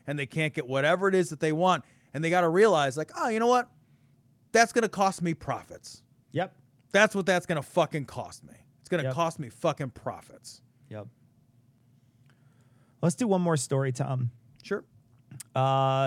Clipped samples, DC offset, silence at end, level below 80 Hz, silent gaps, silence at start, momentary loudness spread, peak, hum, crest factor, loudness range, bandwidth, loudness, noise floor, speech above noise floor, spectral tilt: under 0.1%; under 0.1%; 0 s; -68 dBFS; none; 0.05 s; 20 LU; -6 dBFS; none; 22 dB; 9 LU; 16 kHz; -27 LUFS; -63 dBFS; 36 dB; -5 dB/octave